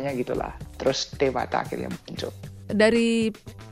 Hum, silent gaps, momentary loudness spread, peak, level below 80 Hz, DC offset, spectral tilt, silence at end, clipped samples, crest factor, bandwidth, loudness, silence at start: none; none; 15 LU; -6 dBFS; -48 dBFS; under 0.1%; -5 dB/octave; 0 s; under 0.1%; 20 dB; 15 kHz; -26 LUFS; 0 s